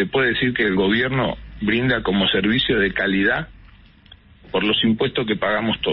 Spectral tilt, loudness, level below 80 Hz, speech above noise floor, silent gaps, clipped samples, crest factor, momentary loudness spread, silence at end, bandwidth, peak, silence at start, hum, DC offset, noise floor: -10.5 dB/octave; -19 LUFS; -42 dBFS; 29 dB; none; under 0.1%; 12 dB; 6 LU; 0 s; 5.8 kHz; -8 dBFS; 0 s; none; under 0.1%; -48 dBFS